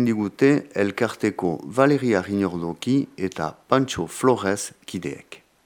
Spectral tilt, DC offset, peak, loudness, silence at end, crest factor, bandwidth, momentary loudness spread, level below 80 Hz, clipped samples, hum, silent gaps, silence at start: -5.5 dB/octave; under 0.1%; -2 dBFS; -23 LUFS; 0.3 s; 20 dB; 17 kHz; 12 LU; -60 dBFS; under 0.1%; none; none; 0 s